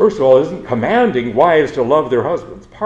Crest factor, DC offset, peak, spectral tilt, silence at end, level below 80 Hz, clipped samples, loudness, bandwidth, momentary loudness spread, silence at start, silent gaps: 14 dB; under 0.1%; 0 dBFS; -7 dB/octave; 0 s; -46 dBFS; under 0.1%; -14 LUFS; 8 kHz; 8 LU; 0 s; none